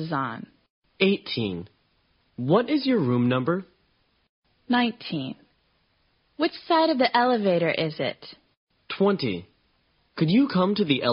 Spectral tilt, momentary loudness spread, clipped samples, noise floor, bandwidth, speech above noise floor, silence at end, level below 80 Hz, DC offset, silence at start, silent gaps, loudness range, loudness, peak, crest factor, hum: -4.5 dB/octave; 16 LU; under 0.1%; -68 dBFS; 5.6 kHz; 44 dB; 0 s; -66 dBFS; under 0.1%; 0 s; 0.70-0.82 s, 4.29-4.42 s, 8.57-8.67 s; 4 LU; -24 LUFS; -8 dBFS; 18 dB; none